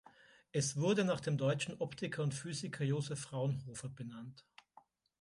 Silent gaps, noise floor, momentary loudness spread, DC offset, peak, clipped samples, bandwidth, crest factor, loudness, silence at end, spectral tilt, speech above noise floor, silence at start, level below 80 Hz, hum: none; -67 dBFS; 14 LU; under 0.1%; -22 dBFS; under 0.1%; 11.5 kHz; 16 dB; -38 LUFS; 0.8 s; -5 dB/octave; 29 dB; 0.55 s; -72 dBFS; none